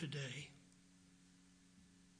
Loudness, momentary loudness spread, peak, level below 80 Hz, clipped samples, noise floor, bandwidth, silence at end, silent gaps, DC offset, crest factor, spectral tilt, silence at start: -49 LUFS; 21 LU; -32 dBFS; -80 dBFS; under 0.1%; -68 dBFS; 10.5 kHz; 0 s; none; under 0.1%; 20 dB; -4.5 dB/octave; 0 s